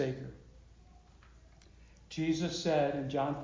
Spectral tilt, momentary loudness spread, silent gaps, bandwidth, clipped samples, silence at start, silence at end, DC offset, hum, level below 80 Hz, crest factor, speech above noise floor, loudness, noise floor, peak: -6 dB/octave; 16 LU; none; 7.6 kHz; under 0.1%; 0 s; 0 s; under 0.1%; none; -60 dBFS; 18 dB; 25 dB; -34 LUFS; -59 dBFS; -18 dBFS